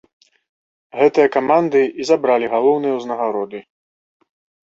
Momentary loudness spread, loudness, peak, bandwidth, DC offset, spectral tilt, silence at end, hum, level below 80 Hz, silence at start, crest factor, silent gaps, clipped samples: 12 LU; -17 LUFS; -2 dBFS; 7.8 kHz; under 0.1%; -5.5 dB/octave; 1.05 s; none; -66 dBFS; 0.95 s; 16 dB; none; under 0.1%